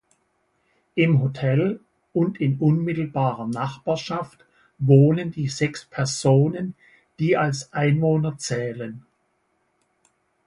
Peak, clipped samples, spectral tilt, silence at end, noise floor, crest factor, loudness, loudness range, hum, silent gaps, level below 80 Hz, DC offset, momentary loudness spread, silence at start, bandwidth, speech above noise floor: -2 dBFS; under 0.1%; -6.5 dB/octave; 1.45 s; -69 dBFS; 20 dB; -22 LUFS; 4 LU; none; none; -58 dBFS; under 0.1%; 12 LU; 0.95 s; 11.5 kHz; 48 dB